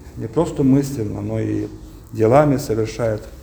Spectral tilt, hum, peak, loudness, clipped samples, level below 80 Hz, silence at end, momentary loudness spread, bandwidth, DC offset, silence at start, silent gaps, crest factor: -7.5 dB/octave; none; 0 dBFS; -19 LUFS; under 0.1%; -40 dBFS; 0 s; 11 LU; over 20 kHz; under 0.1%; 0 s; none; 20 dB